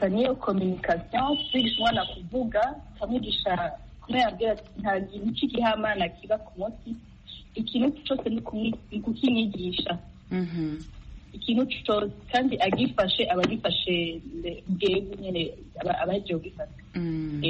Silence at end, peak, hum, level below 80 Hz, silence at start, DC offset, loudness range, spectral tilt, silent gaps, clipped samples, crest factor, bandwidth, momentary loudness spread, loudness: 0 s; -10 dBFS; none; -48 dBFS; 0 s; under 0.1%; 4 LU; -3.5 dB/octave; none; under 0.1%; 18 dB; 8 kHz; 11 LU; -28 LUFS